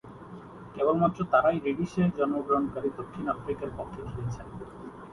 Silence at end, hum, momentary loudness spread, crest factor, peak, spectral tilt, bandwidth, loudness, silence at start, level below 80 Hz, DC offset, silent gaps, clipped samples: 0 s; none; 20 LU; 20 dB; -10 dBFS; -8.5 dB/octave; 11.5 kHz; -29 LUFS; 0.05 s; -54 dBFS; under 0.1%; none; under 0.1%